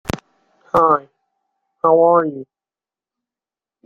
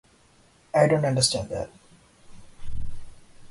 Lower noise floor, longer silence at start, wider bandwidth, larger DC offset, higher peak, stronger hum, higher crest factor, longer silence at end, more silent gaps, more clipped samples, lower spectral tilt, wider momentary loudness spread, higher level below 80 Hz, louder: first, under -90 dBFS vs -58 dBFS; second, 0.15 s vs 0.75 s; first, 14.5 kHz vs 11.5 kHz; neither; about the same, -2 dBFS vs -4 dBFS; neither; about the same, 18 dB vs 22 dB; first, 1.4 s vs 0.05 s; neither; neither; first, -7 dB/octave vs -4 dB/octave; second, 17 LU vs 20 LU; second, -50 dBFS vs -44 dBFS; first, -16 LUFS vs -23 LUFS